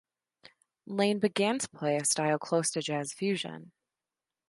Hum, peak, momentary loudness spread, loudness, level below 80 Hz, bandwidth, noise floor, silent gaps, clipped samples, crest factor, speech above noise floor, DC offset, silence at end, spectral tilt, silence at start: none; -14 dBFS; 8 LU; -30 LUFS; -78 dBFS; 11.5 kHz; under -90 dBFS; none; under 0.1%; 18 dB; over 60 dB; under 0.1%; 0.85 s; -3.5 dB/octave; 0.9 s